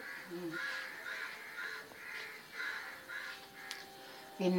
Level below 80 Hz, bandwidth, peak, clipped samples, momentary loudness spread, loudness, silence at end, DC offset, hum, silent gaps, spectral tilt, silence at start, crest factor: -84 dBFS; 17 kHz; -20 dBFS; under 0.1%; 7 LU; -43 LUFS; 0 s; under 0.1%; none; none; -4.5 dB/octave; 0 s; 22 dB